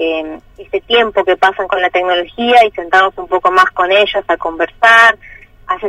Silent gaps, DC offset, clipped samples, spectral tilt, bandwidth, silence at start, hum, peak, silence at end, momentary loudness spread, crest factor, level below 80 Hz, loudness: none; under 0.1%; 0.1%; -2.5 dB/octave; 14 kHz; 0 s; none; 0 dBFS; 0 s; 13 LU; 12 dB; -44 dBFS; -11 LUFS